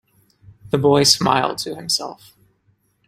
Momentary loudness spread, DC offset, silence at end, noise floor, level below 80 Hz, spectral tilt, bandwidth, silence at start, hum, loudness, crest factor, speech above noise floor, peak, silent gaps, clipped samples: 12 LU; under 0.1%; 0.95 s; -63 dBFS; -54 dBFS; -3.5 dB/octave; 16 kHz; 0.65 s; none; -17 LUFS; 20 dB; 45 dB; 0 dBFS; none; under 0.1%